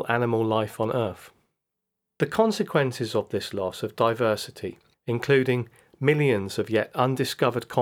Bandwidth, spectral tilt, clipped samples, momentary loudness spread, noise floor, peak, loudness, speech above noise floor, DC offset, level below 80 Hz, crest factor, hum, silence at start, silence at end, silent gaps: 17.5 kHz; -6 dB/octave; under 0.1%; 9 LU; -83 dBFS; -6 dBFS; -25 LUFS; 58 dB; under 0.1%; -68 dBFS; 20 dB; none; 0 s; 0 s; none